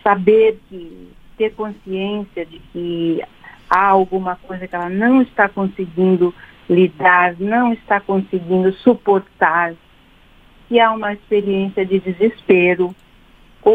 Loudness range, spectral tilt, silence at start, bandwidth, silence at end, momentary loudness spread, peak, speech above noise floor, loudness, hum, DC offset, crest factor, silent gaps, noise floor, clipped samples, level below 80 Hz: 4 LU; -8.5 dB/octave; 0.05 s; 4.9 kHz; 0 s; 12 LU; 0 dBFS; 32 dB; -16 LUFS; none; under 0.1%; 16 dB; none; -49 dBFS; under 0.1%; -50 dBFS